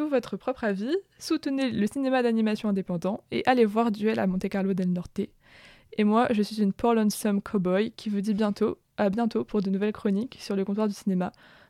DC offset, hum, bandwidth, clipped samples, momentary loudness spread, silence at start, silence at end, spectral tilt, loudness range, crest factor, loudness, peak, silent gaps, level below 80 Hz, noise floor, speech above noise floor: under 0.1%; none; 14 kHz; under 0.1%; 7 LU; 0 s; 0.4 s; -6.5 dB/octave; 2 LU; 18 dB; -27 LUFS; -10 dBFS; none; -60 dBFS; -54 dBFS; 27 dB